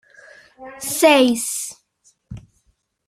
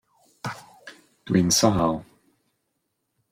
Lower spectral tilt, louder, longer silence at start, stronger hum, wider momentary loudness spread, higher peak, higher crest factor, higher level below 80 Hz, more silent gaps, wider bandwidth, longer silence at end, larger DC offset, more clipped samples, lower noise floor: second, -2.5 dB/octave vs -4.5 dB/octave; first, -17 LUFS vs -21 LUFS; first, 0.6 s vs 0.45 s; neither; first, 27 LU vs 18 LU; about the same, -2 dBFS vs -4 dBFS; about the same, 20 dB vs 22 dB; about the same, -56 dBFS vs -52 dBFS; neither; about the same, 16 kHz vs 16.5 kHz; second, 0.7 s vs 1.3 s; neither; neither; second, -65 dBFS vs -77 dBFS